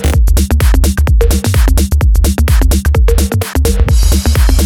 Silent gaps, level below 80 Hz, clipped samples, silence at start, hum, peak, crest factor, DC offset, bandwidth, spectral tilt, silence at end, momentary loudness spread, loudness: none; -10 dBFS; under 0.1%; 0 s; none; 0 dBFS; 8 dB; under 0.1%; 17.5 kHz; -5.5 dB/octave; 0 s; 2 LU; -11 LUFS